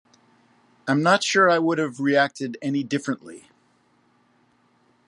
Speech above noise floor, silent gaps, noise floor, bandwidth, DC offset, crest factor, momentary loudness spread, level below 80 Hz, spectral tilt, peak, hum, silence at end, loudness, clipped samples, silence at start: 41 dB; none; -63 dBFS; 11 kHz; under 0.1%; 20 dB; 14 LU; -76 dBFS; -4.5 dB/octave; -4 dBFS; none; 1.7 s; -22 LUFS; under 0.1%; 0.85 s